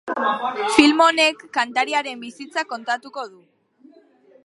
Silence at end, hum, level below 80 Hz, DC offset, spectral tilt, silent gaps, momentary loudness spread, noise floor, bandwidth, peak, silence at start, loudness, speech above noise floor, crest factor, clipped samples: 1.15 s; none; -62 dBFS; under 0.1%; -2 dB/octave; none; 18 LU; -53 dBFS; 11.5 kHz; 0 dBFS; 0.05 s; -19 LUFS; 32 dB; 22 dB; under 0.1%